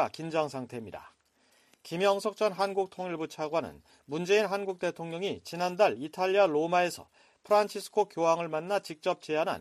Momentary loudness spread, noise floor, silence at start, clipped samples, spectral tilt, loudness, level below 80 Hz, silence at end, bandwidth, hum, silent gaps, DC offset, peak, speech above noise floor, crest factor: 12 LU; -67 dBFS; 0 s; under 0.1%; -4.5 dB/octave; -30 LUFS; -74 dBFS; 0 s; 13.5 kHz; none; none; under 0.1%; -12 dBFS; 37 dB; 18 dB